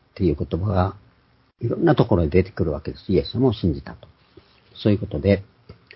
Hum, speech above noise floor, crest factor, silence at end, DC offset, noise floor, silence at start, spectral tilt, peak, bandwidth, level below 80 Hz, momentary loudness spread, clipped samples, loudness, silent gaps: none; 39 dB; 20 dB; 0.25 s; under 0.1%; -60 dBFS; 0.15 s; -12.5 dB/octave; -2 dBFS; 5.8 kHz; -36 dBFS; 9 LU; under 0.1%; -22 LUFS; none